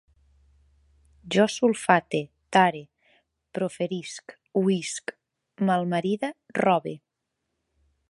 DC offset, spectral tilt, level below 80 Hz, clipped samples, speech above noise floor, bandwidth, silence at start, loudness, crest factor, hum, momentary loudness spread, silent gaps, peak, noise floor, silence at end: under 0.1%; -5 dB/octave; -66 dBFS; under 0.1%; 57 dB; 11.5 kHz; 1.25 s; -25 LUFS; 24 dB; none; 17 LU; none; -2 dBFS; -81 dBFS; 1.15 s